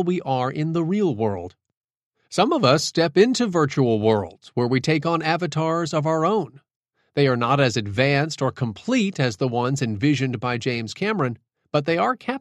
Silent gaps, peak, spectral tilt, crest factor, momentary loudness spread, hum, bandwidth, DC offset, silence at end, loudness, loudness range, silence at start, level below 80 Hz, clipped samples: 1.77-1.81 s, 2.06-2.10 s, 6.76-6.81 s; -2 dBFS; -6 dB/octave; 20 dB; 8 LU; none; 12 kHz; under 0.1%; 0 s; -22 LUFS; 3 LU; 0 s; -60 dBFS; under 0.1%